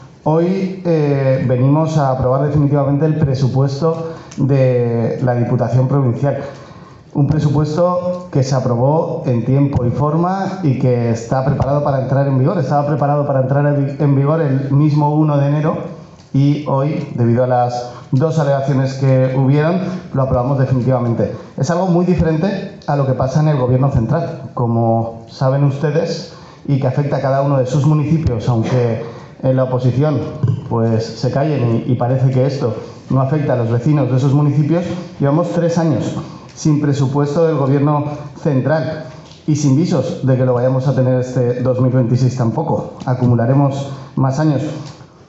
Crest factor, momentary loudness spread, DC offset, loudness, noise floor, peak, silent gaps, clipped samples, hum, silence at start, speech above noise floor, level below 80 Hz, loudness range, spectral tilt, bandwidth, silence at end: 12 dB; 7 LU; under 0.1%; -16 LUFS; -38 dBFS; -2 dBFS; none; under 0.1%; none; 0 s; 23 dB; -42 dBFS; 2 LU; -8.5 dB/octave; 7.8 kHz; 0.25 s